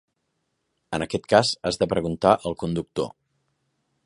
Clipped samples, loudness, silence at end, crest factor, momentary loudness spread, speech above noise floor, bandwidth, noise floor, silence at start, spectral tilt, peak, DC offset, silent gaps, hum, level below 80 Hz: under 0.1%; -24 LUFS; 0.95 s; 24 dB; 11 LU; 53 dB; 11.5 kHz; -76 dBFS; 0.9 s; -5 dB/octave; -2 dBFS; under 0.1%; none; none; -52 dBFS